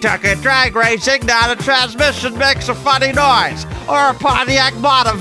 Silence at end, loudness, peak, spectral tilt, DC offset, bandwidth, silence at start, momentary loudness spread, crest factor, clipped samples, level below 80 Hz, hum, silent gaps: 0 s; -13 LUFS; 0 dBFS; -3 dB/octave; under 0.1%; 11 kHz; 0 s; 3 LU; 14 dB; under 0.1%; -34 dBFS; none; none